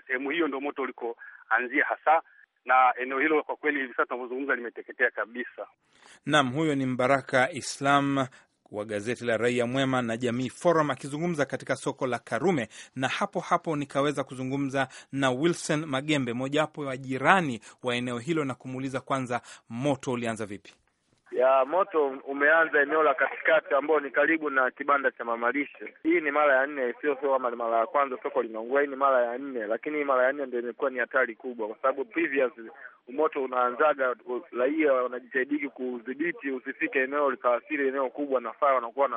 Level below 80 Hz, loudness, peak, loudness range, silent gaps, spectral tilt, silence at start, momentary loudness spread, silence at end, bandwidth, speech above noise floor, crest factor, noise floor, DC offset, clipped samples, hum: -72 dBFS; -27 LUFS; -4 dBFS; 4 LU; none; -5 dB/octave; 0.1 s; 10 LU; 0 s; 11.5 kHz; 38 dB; 24 dB; -65 dBFS; under 0.1%; under 0.1%; none